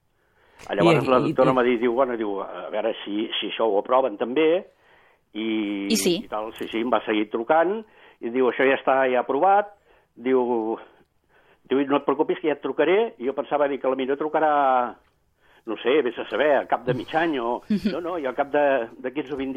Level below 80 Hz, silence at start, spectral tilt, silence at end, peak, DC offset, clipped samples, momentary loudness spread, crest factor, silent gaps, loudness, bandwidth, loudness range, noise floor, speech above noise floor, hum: -62 dBFS; 0.6 s; -5 dB/octave; 0 s; -6 dBFS; under 0.1%; under 0.1%; 11 LU; 18 dB; none; -23 LUFS; 14.5 kHz; 3 LU; -62 dBFS; 40 dB; none